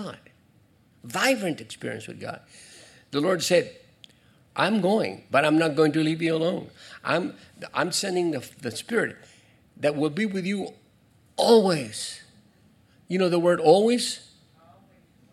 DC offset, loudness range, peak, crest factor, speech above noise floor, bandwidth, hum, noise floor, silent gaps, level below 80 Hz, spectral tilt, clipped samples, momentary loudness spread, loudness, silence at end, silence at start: under 0.1%; 6 LU; -6 dBFS; 20 dB; 36 dB; 14 kHz; none; -60 dBFS; none; -72 dBFS; -4.5 dB/octave; under 0.1%; 17 LU; -24 LUFS; 1.1 s; 0 s